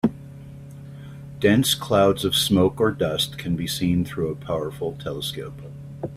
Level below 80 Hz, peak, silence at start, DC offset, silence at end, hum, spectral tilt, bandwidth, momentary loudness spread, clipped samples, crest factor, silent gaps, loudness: -48 dBFS; -6 dBFS; 0.05 s; under 0.1%; 0 s; none; -5 dB/octave; 16 kHz; 21 LU; under 0.1%; 18 dB; none; -22 LUFS